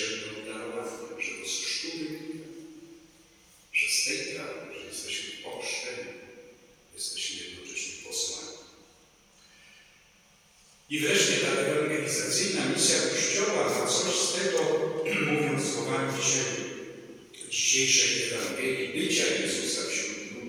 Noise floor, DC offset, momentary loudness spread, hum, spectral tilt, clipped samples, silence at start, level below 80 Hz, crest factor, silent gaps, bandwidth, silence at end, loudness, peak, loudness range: -60 dBFS; under 0.1%; 16 LU; none; -2 dB/octave; under 0.1%; 0 s; -72 dBFS; 20 dB; none; over 20 kHz; 0 s; -27 LUFS; -10 dBFS; 10 LU